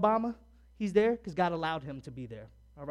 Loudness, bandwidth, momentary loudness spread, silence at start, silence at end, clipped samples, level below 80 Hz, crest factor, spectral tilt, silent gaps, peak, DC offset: -31 LUFS; 10.5 kHz; 18 LU; 0 s; 0 s; under 0.1%; -58 dBFS; 20 dB; -7 dB/octave; none; -12 dBFS; under 0.1%